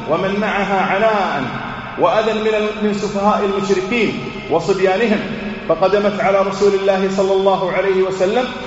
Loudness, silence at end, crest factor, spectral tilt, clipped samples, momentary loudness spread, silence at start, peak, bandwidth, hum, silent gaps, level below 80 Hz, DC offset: -16 LUFS; 0 s; 16 dB; -4 dB/octave; under 0.1%; 5 LU; 0 s; 0 dBFS; 8 kHz; none; none; -44 dBFS; under 0.1%